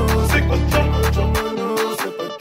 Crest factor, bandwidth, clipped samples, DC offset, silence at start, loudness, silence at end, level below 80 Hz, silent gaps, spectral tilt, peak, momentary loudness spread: 14 dB; 16.5 kHz; under 0.1%; under 0.1%; 0 s; -19 LUFS; 0 s; -22 dBFS; none; -5.5 dB/octave; -4 dBFS; 6 LU